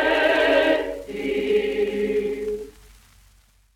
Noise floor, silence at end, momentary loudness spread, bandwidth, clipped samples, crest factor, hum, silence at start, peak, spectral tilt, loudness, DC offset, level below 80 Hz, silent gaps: -57 dBFS; 1.05 s; 12 LU; 15.5 kHz; under 0.1%; 18 dB; none; 0 s; -6 dBFS; -4.5 dB/octave; -22 LUFS; under 0.1%; -50 dBFS; none